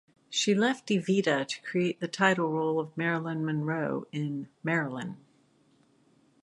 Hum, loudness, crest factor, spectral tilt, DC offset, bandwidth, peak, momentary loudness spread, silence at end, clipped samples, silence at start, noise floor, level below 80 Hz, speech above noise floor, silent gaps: none; -29 LUFS; 22 dB; -5 dB/octave; under 0.1%; 11.5 kHz; -8 dBFS; 10 LU; 1.25 s; under 0.1%; 0.3 s; -65 dBFS; -76 dBFS; 36 dB; none